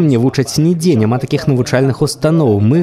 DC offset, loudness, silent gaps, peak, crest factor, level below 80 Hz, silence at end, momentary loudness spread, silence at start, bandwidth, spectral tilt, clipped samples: under 0.1%; -13 LUFS; none; 0 dBFS; 12 dB; -46 dBFS; 0 s; 3 LU; 0 s; 14 kHz; -6.5 dB/octave; under 0.1%